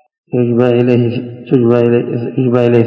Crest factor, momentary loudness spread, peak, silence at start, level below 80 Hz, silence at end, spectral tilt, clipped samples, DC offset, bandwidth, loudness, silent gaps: 12 dB; 8 LU; 0 dBFS; 0.35 s; -54 dBFS; 0 s; -10 dB/octave; 0.6%; under 0.1%; 5.6 kHz; -13 LUFS; none